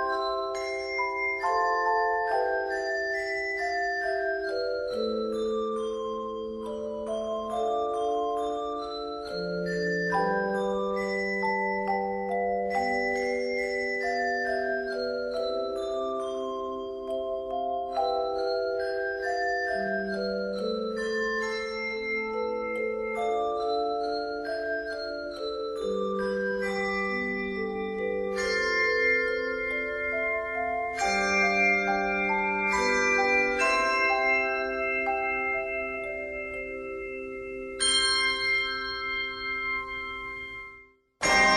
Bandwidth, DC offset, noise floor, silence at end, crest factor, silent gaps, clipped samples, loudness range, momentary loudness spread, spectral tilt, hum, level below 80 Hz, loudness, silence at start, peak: 12 kHz; under 0.1%; -54 dBFS; 0 s; 18 dB; none; under 0.1%; 6 LU; 10 LU; -3 dB/octave; none; -56 dBFS; -28 LUFS; 0 s; -10 dBFS